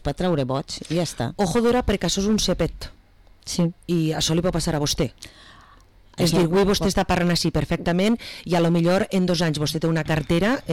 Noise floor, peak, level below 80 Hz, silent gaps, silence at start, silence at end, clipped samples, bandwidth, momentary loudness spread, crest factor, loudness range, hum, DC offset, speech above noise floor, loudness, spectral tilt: -52 dBFS; -12 dBFS; -38 dBFS; none; 0 s; 0 s; under 0.1%; 16.5 kHz; 8 LU; 10 dB; 4 LU; none; 0.2%; 30 dB; -22 LUFS; -5 dB/octave